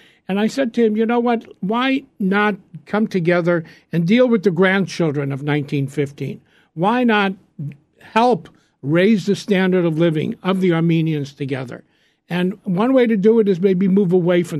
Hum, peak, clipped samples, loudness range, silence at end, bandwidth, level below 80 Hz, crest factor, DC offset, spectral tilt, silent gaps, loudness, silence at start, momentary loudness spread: none; 0 dBFS; under 0.1%; 3 LU; 0 s; 12.5 kHz; -64 dBFS; 16 dB; under 0.1%; -7 dB/octave; none; -18 LUFS; 0.3 s; 11 LU